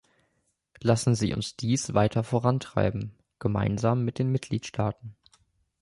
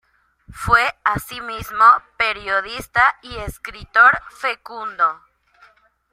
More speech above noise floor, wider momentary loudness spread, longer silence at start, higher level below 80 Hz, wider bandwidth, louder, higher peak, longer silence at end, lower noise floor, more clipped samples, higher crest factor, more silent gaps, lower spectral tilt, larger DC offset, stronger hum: first, 48 dB vs 35 dB; second, 8 LU vs 17 LU; first, 0.8 s vs 0.5 s; second, -50 dBFS vs -44 dBFS; second, 11.5 kHz vs 16 kHz; second, -27 LUFS vs -17 LUFS; second, -8 dBFS vs 0 dBFS; second, 0.7 s vs 0.95 s; first, -74 dBFS vs -54 dBFS; neither; about the same, 20 dB vs 18 dB; neither; first, -6 dB/octave vs -3.5 dB/octave; neither; neither